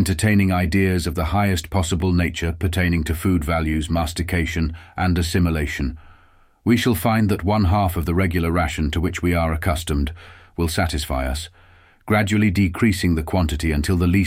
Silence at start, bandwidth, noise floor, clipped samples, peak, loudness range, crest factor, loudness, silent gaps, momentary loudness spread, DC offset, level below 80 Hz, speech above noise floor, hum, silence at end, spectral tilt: 0 s; 16 kHz; -53 dBFS; under 0.1%; -4 dBFS; 3 LU; 16 dB; -21 LUFS; none; 7 LU; under 0.1%; -30 dBFS; 34 dB; none; 0 s; -6 dB/octave